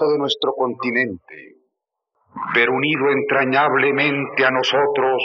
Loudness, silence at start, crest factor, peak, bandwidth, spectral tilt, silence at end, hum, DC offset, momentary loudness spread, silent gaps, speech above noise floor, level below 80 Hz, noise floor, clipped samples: -18 LUFS; 0 s; 16 dB; -4 dBFS; 7.2 kHz; -5 dB/octave; 0 s; none; under 0.1%; 5 LU; none; 59 dB; -78 dBFS; -78 dBFS; under 0.1%